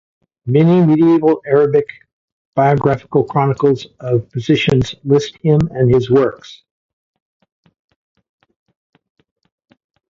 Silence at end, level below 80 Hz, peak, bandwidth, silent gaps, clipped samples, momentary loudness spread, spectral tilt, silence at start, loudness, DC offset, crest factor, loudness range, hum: 3.55 s; -46 dBFS; 0 dBFS; 7.6 kHz; 2.13-2.53 s; under 0.1%; 8 LU; -8 dB/octave; 0.45 s; -14 LUFS; under 0.1%; 16 dB; 5 LU; none